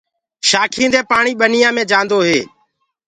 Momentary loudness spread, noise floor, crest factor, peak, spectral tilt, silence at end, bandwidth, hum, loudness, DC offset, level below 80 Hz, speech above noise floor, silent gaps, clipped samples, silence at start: 5 LU; -63 dBFS; 16 dB; 0 dBFS; -2.5 dB/octave; 0.65 s; 11 kHz; none; -13 LUFS; under 0.1%; -56 dBFS; 50 dB; none; under 0.1%; 0.45 s